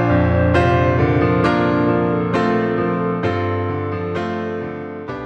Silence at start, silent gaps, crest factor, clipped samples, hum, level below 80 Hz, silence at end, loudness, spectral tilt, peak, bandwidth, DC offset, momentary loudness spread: 0 s; none; 16 dB; under 0.1%; none; -36 dBFS; 0 s; -18 LUFS; -8.5 dB/octave; -2 dBFS; 8.4 kHz; under 0.1%; 9 LU